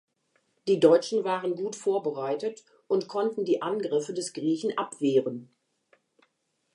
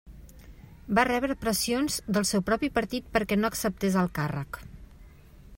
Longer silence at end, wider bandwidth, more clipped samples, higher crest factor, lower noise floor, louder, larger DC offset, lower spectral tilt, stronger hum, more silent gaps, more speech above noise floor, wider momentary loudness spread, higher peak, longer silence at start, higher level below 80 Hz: first, 1.3 s vs 0 s; second, 11 kHz vs 16.5 kHz; neither; about the same, 22 dB vs 22 dB; first, -75 dBFS vs -50 dBFS; about the same, -27 LUFS vs -27 LUFS; neither; about the same, -5 dB/octave vs -4.5 dB/octave; neither; neither; first, 49 dB vs 23 dB; first, 11 LU vs 7 LU; about the same, -6 dBFS vs -6 dBFS; first, 0.65 s vs 0.05 s; second, -84 dBFS vs -48 dBFS